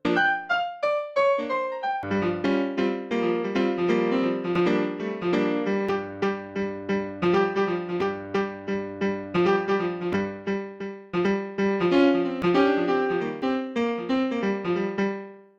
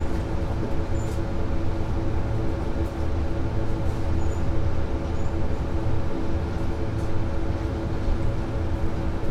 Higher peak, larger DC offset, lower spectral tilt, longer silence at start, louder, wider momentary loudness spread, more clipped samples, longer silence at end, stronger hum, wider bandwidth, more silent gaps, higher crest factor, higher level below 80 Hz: about the same, -8 dBFS vs -10 dBFS; neither; about the same, -7 dB/octave vs -8 dB/octave; about the same, 0.05 s vs 0 s; first, -25 LUFS vs -28 LUFS; first, 7 LU vs 2 LU; neither; first, 0.15 s vs 0 s; neither; about the same, 7.6 kHz vs 7.6 kHz; neither; about the same, 16 dB vs 14 dB; second, -62 dBFS vs -28 dBFS